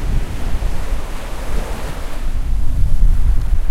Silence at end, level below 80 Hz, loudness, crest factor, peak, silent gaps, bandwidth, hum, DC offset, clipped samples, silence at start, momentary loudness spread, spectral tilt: 0 s; -16 dBFS; -23 LUFS; 14 dB; 0 dBFS; none; 12 kHz; none; under 0.1%; under 0.1%; 0 s; 9 LU; -6 dB/octave